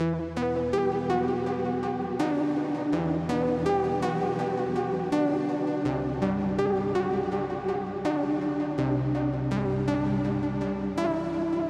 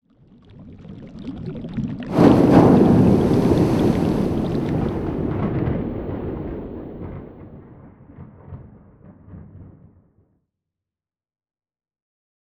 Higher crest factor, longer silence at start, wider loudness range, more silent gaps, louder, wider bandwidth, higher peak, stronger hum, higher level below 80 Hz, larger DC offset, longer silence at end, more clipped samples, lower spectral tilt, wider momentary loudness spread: second, 14 dB vs 20 dB; second, 0 s vs 0.6 s; second, 1 LU vs 20 LU; neither; second, -28 LUFS vs -18 LUFS; second, 10 kHz vs 13 kHz; second, -14 dBFS vs -2 dBFS; neither; second, -48 dBFS vs -38 dBFS; neither; second, 0 s vs 2.8 s; neither; about the same, -8 dB/octave vs -9 dB/octave; second, 3 LU vs 26 LU